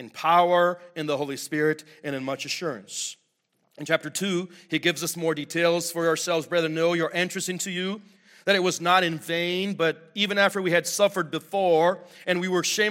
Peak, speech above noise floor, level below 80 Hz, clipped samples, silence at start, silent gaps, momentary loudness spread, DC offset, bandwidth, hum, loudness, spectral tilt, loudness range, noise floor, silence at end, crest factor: -4 dBFS; 47 dB; -74 dBFS; under 0.1%; 0 s; none; 10 LU; under 0.1%; 16.5 kHz; none; -25 LUFS; -3.5 dB/octave; 6 LU; -72 dBFS; 0 s; 20 dB